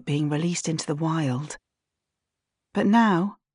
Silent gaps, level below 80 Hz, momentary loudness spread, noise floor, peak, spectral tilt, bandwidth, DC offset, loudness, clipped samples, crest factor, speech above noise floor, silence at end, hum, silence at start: none; -70 dBFS; 12 LU; -85 dBFS; -10 dBFS; -5.5 dB/octave; 11 kHz; under 0.1%; -24 LUFS; under 0.1%; 16 dB; 61 dB; 0.2 s; none; 0.05 s